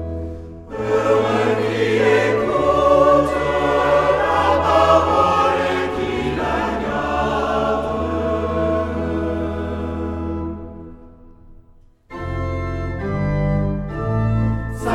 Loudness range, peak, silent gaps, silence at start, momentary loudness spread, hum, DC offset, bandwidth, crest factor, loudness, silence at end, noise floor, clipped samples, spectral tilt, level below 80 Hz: 12 LU; -2 dBFS; none; 0 s; 12 LU; none; under 0.1%; 13 kHz; 18 dB; -19 LUFS; 0 s; -49 dBFS; under 0.1%; -6.5 dB/octave; -34 dBFS